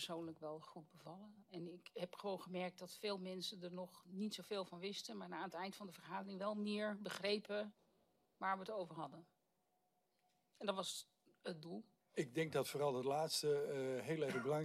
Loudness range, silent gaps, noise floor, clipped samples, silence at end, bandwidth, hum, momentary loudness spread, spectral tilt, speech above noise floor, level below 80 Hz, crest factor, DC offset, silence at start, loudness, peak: 7 LU; none; -84 dBFS; under 0.1%; 0 s; 15.5 kHz; none; 13 LU; -4.5 dB/octave; 39 dB; under -90 dBFS; 20 dB; under 0.1%; 0 s; -45 LUFS; -26 dBFS